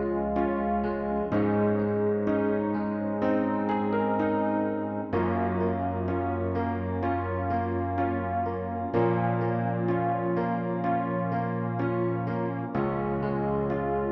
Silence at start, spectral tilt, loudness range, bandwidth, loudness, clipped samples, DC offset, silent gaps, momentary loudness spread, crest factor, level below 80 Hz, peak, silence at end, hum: 0 s; -11 dB/octave; 2 LU; 5.6 kHz; -28 LUFS; under 0.1%; under 0.1%; none; 4 LU; 14 dB; -50 dBFS; -14 dBFS; 0 s; none